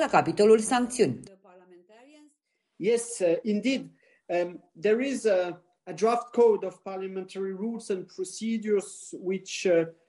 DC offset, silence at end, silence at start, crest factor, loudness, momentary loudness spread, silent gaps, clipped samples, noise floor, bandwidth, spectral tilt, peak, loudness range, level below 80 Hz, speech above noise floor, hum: under 0.1%; 0.15 s; 0 s; 20 dB; -27 LUFS; 14 LU; none; under 0.1%; -75 dBFS; 11.5 kHz; -4.5 dB/octave; -8 dBFS; 4 LU; -72 dBFS; 48 dB; none